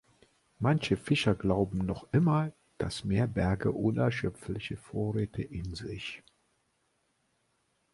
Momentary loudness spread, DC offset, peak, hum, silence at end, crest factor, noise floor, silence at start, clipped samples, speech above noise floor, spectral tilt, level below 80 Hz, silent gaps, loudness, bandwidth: 11 LU; under 0.1%; -12 dBFS; none; 1.75 s; 20 dB; -75 dBFS; 0.6 s; under 0.1%; 45 dB; -7 dB/octave; -50 dBFS; none; -31 LUFS; 11.5 kHz